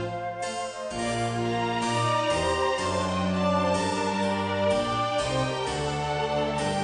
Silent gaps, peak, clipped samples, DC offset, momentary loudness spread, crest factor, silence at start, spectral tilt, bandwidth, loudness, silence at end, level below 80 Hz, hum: none; -12 dBFS; under 0.1%; under 0.1%; 7 LU; 14 dB; 0 s; -5 dB/octave; 10 kHz; -27 LUFS; 0 s; -48 dBFS; none